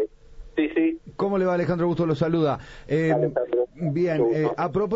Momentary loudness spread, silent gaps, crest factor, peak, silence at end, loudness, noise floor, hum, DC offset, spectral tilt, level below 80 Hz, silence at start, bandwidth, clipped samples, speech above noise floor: 5 LU; none; 14 dB; -10 dBFS; 0 s; -24 LUFS; -43 dBFS; none; under 0.1%; -8.5 dB/octave; -50 dBFS; 0 s; 7.8 kHz; under 0.1%; 20 dB